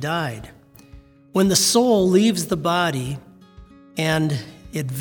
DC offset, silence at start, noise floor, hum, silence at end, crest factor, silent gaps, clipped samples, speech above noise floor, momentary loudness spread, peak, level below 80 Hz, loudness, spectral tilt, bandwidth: under 0.1%; 0 s; -47 dBFS; none; 0 s; 18 dB; none; under 0.1%; 27 dB; 16 LU; -2 dBFS; -50 dBFS; -20 LUFS; -4 dB/octave; over 20 kHz